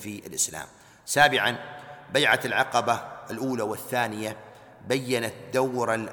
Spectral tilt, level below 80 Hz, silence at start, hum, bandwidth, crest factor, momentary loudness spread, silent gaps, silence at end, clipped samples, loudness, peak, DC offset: -3 dB/octave; -64 dBFS; 0 s; none; 19 kHz; 20 dB; 18 LU; none; 0 s; under 0.1%; -25 LUFS; -6 dBFS; under 0.1%